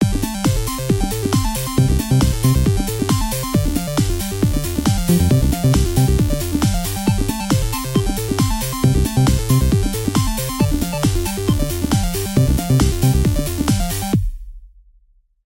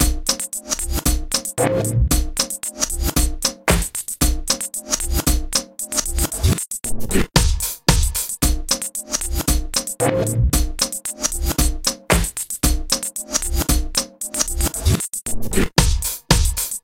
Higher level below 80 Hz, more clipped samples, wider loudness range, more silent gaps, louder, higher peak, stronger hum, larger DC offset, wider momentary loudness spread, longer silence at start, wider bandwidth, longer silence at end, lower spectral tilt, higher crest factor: about the same, -24 dBFS vs -24 dBFS; neither; about the same, 1 LU vs 1 LU; neither; about the same, -18 LUFS vs -20 LUFS; about the same, -2 dBFS vs -2 dBFS; neither; neither; about the same, 4 LU vs 5 LU; about the same, 0 s vs 0 s; about the same, 17 kHz vs 17 kHz; first, 0.8 s vs 0.05 s; first, -5.5 dB/octave vs -3.5 dB/octave; about the same, 16 dB vs 18 dB